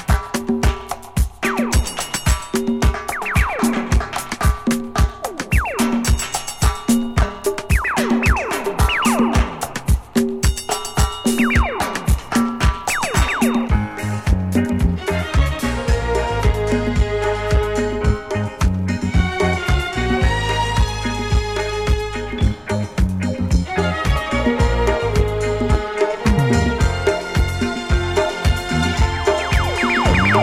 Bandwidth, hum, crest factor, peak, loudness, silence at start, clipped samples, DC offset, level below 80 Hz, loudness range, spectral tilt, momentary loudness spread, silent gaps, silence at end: 16.5 kHz; none; 16 dB; -2 dBFS; -19 LUFS; 0 s; under 0.1%; under 0.1%; -22 dBFS; 2 LU; -5 dB/octave; 5 LU; none; 0 s